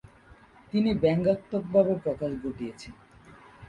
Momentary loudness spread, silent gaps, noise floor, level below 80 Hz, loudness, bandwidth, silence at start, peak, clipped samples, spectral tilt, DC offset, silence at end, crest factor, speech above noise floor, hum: 14 LU; none; -55 dBFS; -54 dBFS; -27 LUFS; 11 kHz; 0.75 s; -8 dBFS; under 0.1%; -8 dB/octave; under 0.1%; 0.05 s; 20 dB; 28 dB; none